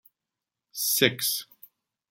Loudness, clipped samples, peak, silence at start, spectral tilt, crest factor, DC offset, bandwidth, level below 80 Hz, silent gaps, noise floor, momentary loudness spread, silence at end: -24 LUFS; under 0.1%; -6 dBFS; 0.75 s; -2 dB/octave; 24 dB; under 0.1%; 17 kHz; -74 dBFS; none; -88 dBFS; 11 LU; 0.7 s